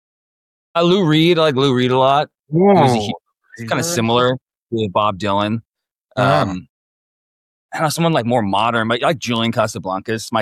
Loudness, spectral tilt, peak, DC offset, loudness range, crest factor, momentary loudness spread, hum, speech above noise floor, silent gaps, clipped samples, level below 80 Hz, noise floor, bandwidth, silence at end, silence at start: -17 LUFS; -5.5 dB/octave; -2 dBFS; under 0.1%; 5 LU; 16 dB; 12 LU; none; 37 dB; 4.42-4.46 s, 4.62-4.66 s, 5.67-5.72 s, 5.92-6.05 s, 6.69-7.69 s; under 0.1%; -54 dBFS; -53 dBFS; 14.5 kHz; 0 s; 0.75 s